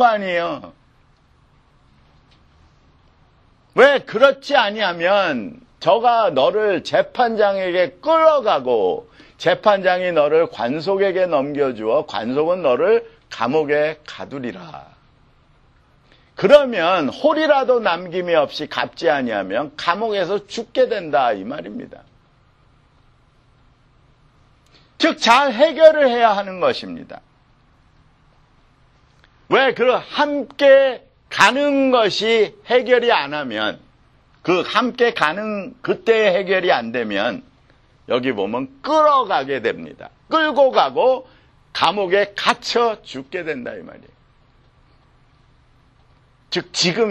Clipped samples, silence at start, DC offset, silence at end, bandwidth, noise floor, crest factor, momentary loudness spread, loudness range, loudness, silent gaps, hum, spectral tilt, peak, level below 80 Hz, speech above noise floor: under 0.1%; 0 s; under 0.1%; 0 s; 10 kHz; -55 dBFS; 18 dB; 13 LU; 8 LU; -17 LUFS; none; none; -4 dB/octave; 0 dBFS; -58 dBFS; 38 dB